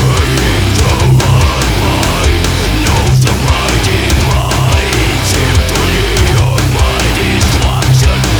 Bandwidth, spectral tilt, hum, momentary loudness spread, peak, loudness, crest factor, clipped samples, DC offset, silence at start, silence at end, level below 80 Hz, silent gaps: over 20 kHz; -4.5 dB/octave; none; 2 LU; 0 dBFS; -10 LUFS; 10 dB; under 0.1%; under 0.1%; 0 s; 0 s; -16 dBFS; none